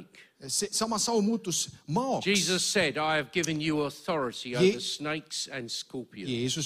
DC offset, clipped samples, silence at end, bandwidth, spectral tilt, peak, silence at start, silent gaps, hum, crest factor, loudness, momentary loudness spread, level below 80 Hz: under 0.1%; under 0.1%; 0 s; 15.5 kHz; -3 dB/octave; -12 dBFS; 0 s; none; none; 18 dB; -29 LUFS; 10 LU; -64 dBFS